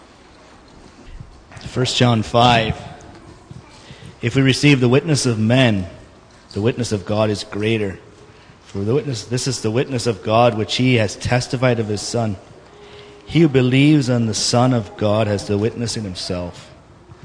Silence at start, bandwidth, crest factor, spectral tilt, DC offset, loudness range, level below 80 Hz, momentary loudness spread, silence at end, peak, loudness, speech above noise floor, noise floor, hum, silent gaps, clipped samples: 1 s; 10.5 kHz; 18 dB; -5.5 dB/octave; under 0.1%; 5 LU; -46 dBFS; 13 LU; 0.6 s; 0 dBFS; -18 LUFS; 28 dB; -45 dBFS; none; none; under 0.1%